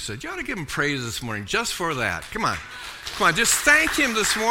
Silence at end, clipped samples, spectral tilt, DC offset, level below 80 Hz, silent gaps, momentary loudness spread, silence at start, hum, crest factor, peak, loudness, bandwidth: 0 s; under 0.1%; -2 dB/octave; under 0.1%; -46 dBFS; none; 14 LU; 0 s; none; 20 dB; -2 dBFS; -22 LUFS; 16.5 kHz